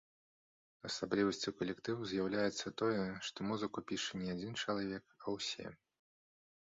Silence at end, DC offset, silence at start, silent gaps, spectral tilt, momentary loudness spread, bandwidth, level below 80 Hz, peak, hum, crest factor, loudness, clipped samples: 0.9 s; under 0.1%; 0.85 s; none; -4 dB/octave; 8 LU; 7.6 kHz; -72 dBFS; -22 dBFS; none; 20 dB; -40 LUFS; under 0.1%